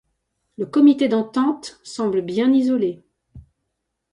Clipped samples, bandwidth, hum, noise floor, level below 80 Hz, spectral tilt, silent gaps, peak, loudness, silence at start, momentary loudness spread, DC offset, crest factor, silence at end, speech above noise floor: under 0.1%; 10.5 kHz; none; -77 dBFS; -58 dBFS; -6 dB/octave; none; -4 dBFS; -19 LUFS; 0.6 s; 16 LU; under 0.1%; 16 dB; 0.75 s; 59 dB